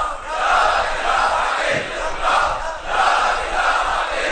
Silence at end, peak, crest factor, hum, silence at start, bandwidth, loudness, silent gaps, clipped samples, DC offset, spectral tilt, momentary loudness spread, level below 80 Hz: 0 s; -4 dBFS; 14 dB; none; 0 s; 9.4 kHz; -18 LUFS; none; under 0.1%; under 0.1%; -2 dB/octave; 6 LU; -34 dBFS